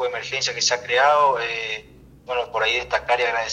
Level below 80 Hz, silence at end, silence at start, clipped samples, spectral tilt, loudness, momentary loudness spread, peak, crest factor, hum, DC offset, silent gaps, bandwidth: -54 dBFS; 0 s; 0 s; under 0.1%; -0.5 dB/octave; -21 LUFS; 10 LU; -6 dBFS; 16 dB; none; under 0.1%; none; 9.8 kHz